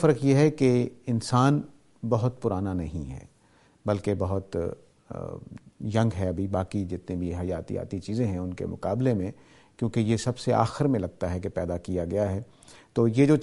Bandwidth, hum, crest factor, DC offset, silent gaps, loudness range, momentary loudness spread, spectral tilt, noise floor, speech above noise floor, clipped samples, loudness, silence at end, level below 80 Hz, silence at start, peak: 11.5 kHz; none; 20 dB; under 0.1%; none; 5 LU; 16 LU; -7.5 dB/octave; -61 dBFS; 35 dB; under 0.1%; -27 LUFS; 0 s; -50 dBFS; 0 s; -6 dBFS